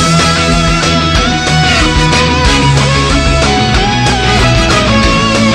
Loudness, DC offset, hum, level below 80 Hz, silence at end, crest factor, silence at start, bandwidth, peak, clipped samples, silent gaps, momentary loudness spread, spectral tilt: -9 LUFS; under 0.1%; none; -18 dBFS; 0 s; 8 dB; 0 s; 14 kHz; 0 dBFS; 0.1%; none; 2 LU; -4 dB/octave